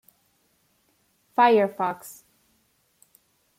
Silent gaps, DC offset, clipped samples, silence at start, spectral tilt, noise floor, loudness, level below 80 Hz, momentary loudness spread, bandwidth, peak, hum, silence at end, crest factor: none; under 0.1%; under 0.1%; 1.4 s; -5 dB/octave; -68 dBFS; -22 LUFS; -78 dBFS; 20 LU; 16 kHz; -8 dBFS; none; 1.5 s; 20 dB